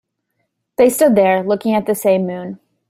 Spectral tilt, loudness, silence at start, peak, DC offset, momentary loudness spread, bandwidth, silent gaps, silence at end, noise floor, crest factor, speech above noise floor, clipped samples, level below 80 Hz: -5.5 dB/octave; -15 LUFS; 0.8 s; -2 dBFS; under 0.1%; 16 LU; 16 kHz; none; 0.35 s; -71 dBFS; 14 dB; 57 dB; under 0.1%; -58 dBFS